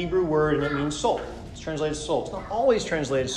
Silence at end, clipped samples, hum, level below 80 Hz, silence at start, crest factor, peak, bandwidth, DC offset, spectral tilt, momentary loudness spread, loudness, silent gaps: 0 s; under 0.1%; none; -44 dBFS; 0 s; 16 dB; -10 dBFS; 11 kHz; under 0.1%; -5 dB/octave; 8 LU; -25 LUFS; none